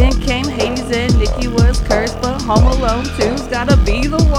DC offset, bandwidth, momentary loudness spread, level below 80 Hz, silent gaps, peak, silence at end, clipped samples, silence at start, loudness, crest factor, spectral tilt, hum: under 0.1%; 13 kHz; 5 LU; -16 dBFS; none; 0 dBFS; 0 s; under 0.1%; 0 s; -15 LUFS; 14 dB; -5.5 dB/octave; none